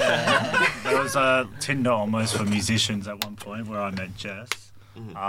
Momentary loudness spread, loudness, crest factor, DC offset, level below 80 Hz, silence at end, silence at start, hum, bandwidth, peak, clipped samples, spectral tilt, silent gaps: 12 LU; -24 LUFS; 20 dB; under 0.1%; -56 dBFS; 0 s; 0 s; none; 17.5 kHz; -6 dBFS; under 0.1%; -4 dB/octave; none